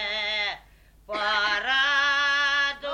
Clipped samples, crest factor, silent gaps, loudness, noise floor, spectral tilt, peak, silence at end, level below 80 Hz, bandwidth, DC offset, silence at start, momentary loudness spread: under 0.1%; 14 dB; none; -23 LUFS; -54 dBFS; 0 dB/octave; -12 dBFS; 0 s; -56 dBFS; 9.6 kHz; under 0.1%; 0 s; 9 LU